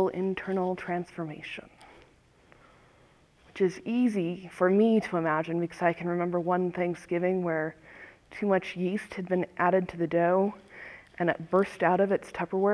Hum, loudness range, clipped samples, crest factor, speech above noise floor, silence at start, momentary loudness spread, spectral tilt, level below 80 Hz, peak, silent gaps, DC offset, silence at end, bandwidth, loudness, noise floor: none; 7 LU; under 0.1%; 18 dB; 33 dB; 0 s; 15 LU; -7.5 dB/octave; -66 dBFS; -10 dBFS; none; under 0.1%; 0 s; 11 kHz; -28 LUFS; -61 dBFS